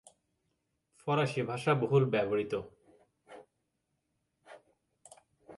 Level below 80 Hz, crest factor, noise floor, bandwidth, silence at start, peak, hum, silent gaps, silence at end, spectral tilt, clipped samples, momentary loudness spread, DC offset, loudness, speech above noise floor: -72 dBFS; 20 dB; -82 dBFS; 11.5 kHz; 1.05 s; -16 dBFS; none; none; 0 s; -7 dB/octave; under 0.1%; 12 LU; under 0.1%; -31 LUFS; 51 dB